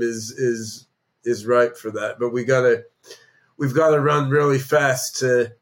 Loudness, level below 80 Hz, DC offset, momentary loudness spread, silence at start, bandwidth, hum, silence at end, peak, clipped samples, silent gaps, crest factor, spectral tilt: -20 LUFS; -70 dBFS; under 0.1%; 10 LU; 0 s; 17 kHz; none; 0.1 s; -6 dBFS; under 0.1%; none; 16 dB; -5 dB/octave